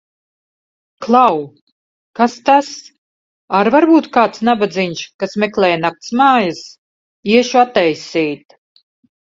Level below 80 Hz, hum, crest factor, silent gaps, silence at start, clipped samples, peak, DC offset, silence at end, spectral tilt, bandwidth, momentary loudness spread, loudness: -60 dBFS; none; 16 dB; 1.61-2.14 s, 2.98-3.48 s, 5.14-5.19 s, 6.78-7.23 s; 1 s; under 0.1%; 0 dBFS; under 0.1%; 0.85 s; -5 dB/octave; 7.8 kHz; 16 LU; -14 LUFS